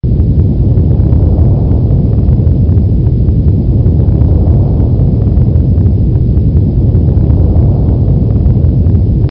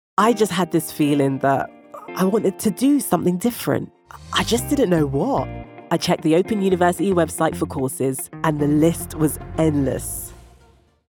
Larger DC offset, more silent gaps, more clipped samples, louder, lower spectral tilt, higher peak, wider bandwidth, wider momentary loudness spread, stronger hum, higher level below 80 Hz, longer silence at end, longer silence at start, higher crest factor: first, 0.6% vs under 0.1%; neither; first, 0.7% vs under 0.1%; first, -9 LUFS vs -20 LUFS; first, -15 dB/octave vs -5.5 dB/octave; about the same, 0 dBFS vs -2 dBFS; second, 1.8 kHz vs over 20 kHz; second, 1 LU vs 8 LU; neither; first, -12 dBFS vs -44 dBFS; second, 0 s vs 0.7 s; second, 0.05 s vs 0.2 s; second, 8 dB vs 18 dB